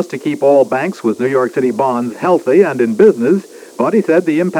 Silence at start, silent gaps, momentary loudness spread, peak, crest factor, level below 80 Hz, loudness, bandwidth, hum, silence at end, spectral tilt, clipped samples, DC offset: 0 s; none; 7 LU; 0 dBFS; 12 dB; -68 dBFS; -13 LUFS; 14.5 kHz; none; 0 s; -7 dB/octave; 0.1%; under 0.1%